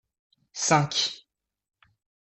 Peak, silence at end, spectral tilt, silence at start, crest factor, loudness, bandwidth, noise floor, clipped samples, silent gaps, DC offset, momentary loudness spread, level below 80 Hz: -6 dBFS; 1.05 s; -3 dB/octave; 0.55 s; 24 dB; -24 LUFS; 8.4 kHz; -70 dBFS; under 0.1%; none; under 0.1%; 20 LU; -68 dBFS